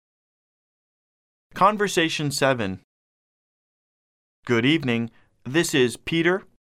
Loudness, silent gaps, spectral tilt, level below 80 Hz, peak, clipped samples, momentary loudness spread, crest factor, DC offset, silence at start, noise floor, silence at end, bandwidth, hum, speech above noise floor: -22 LUFS; 2.84-4.43 s; -4.5 dB/octave; -60 dBFS; -6 dBFS; under 0.1%; 16 LU; 20 dB; under 0.1%; 1.55 s; under -90 dBFS; 0.2 s; 15.5 kHz; none; over 68 dB